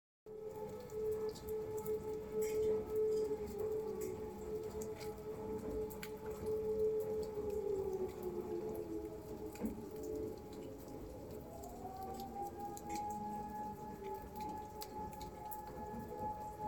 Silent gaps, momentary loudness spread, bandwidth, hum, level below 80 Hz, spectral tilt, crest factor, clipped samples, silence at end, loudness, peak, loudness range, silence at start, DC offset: none; 11 LU; 18 kHz; none; -60 dBFS; -6 dB/octave; 18 dB; under 0.1%; 0 s; -43 LUFS; -24 dBFS; 7 LU; 0.25 s; under 0.1%